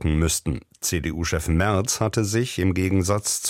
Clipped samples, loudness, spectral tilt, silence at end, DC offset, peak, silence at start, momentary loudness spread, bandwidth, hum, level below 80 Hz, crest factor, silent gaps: under 0.1%; -23 LUFS; -4.5 dB/octave; 0 s; under 0.1%; -6 dBFS; 0 s; 4 LU; 16.5 kHz; none; -34 dBFS; 16 dB; none